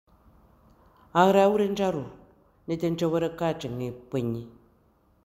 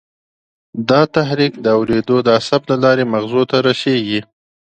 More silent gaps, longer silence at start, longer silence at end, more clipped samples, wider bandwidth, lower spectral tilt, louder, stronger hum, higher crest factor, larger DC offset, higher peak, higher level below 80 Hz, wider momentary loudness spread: neither; first, 1.15 s vs 0.75 s; first, 0.75 s vs 0.55 s; neither; first, 15.5 kHz vs 9 kHz; about the same, -6.5 dB/octave vs -6.5 dB/octave; second, -26 LUFS vs -15 LUFS; neither; first, 22 dB vs 16 dB; neither; second, -6 dBFS vs 0 dBFS; second, -60 dBFS vs -52 dBFS; first, 15 LU vs 5 LU